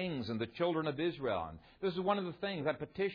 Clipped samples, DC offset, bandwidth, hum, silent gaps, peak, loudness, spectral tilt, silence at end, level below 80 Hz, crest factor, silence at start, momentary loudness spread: under 0.1%; under 0.1%; 5.4 kHz; none; none; -20 dBFS; -37 LUFS; -4.5 dB/octave; 0 s; -66 dBFS; 18 dB; 0 s; 5 LU